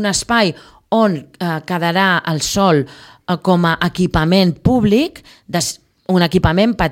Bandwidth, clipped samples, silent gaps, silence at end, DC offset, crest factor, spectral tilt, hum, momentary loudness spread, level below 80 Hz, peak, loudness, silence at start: 16.5 kHz; under 0.1%; none; 0 s; under 0.1%; 14 dB; -5 dB/octave; none; 9 LU; -36 dBFS; 0 dBFS; -16 LUFS; 0 s